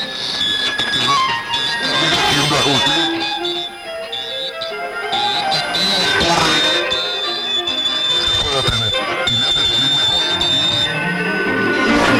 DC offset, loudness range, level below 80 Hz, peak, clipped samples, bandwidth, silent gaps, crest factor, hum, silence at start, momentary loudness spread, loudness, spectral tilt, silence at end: under 0.1%; 3 LU; -42 dBFS; -4 dBFS; under 0.1%; 17 kHz; none; 14 dB; none; 0 s; 9 LU; -15 LUFS; -2.5 dB/octave; 0 s